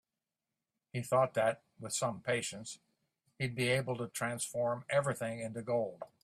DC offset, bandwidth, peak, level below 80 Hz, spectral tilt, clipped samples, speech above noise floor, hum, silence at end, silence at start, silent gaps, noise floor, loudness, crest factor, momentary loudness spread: under 0.1%; 15.5 kHz; -18 dBFS; -72 dBFS; -4 dB/octave; under 0.1%; over 55 dB; none; 0.2 s; 0.95 s; none; under -90 dBFS; -35 LUFS; 18 dB; 11 LU